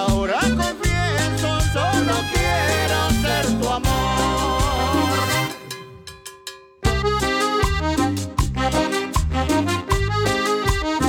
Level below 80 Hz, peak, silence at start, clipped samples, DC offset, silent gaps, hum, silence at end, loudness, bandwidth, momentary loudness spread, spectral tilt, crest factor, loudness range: -28 dBFS; -8 dBFS; 0 s; under 0.1%; under 0.1%; none; none; 0 s; -20 LUFS; over 20 kHz; 7 LU; -4.5 dB/octave; 12 dB; 3 LU